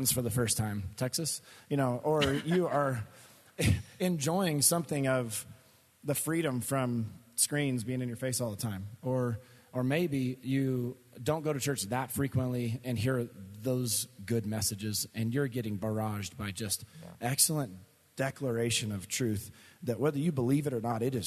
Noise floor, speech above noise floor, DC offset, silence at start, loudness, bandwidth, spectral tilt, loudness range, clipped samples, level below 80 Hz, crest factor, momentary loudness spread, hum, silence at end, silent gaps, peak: -61 dBFS; 29 dB; under 0.1%; 0 s; -32 LUFS; 14 kHz; -4.5 dB/octave; 3 LU; under 0.1%; -62 dBFS; 22 dB; 9 LU; none; 0 s; none; -10 dBFS